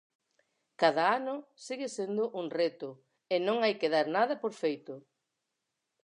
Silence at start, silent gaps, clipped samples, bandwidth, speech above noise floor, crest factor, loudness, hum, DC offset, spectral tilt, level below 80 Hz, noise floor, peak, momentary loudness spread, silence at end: 0.8 s; none; under 0.1%; 10.5 kHz; 54 dB; 22 dB; -31 LUFS; none; under 0.1%; -4.5 dB/octave; under -90 dBFS; -85 dBFS; -10 dBFS; 14 LU; 1.05 s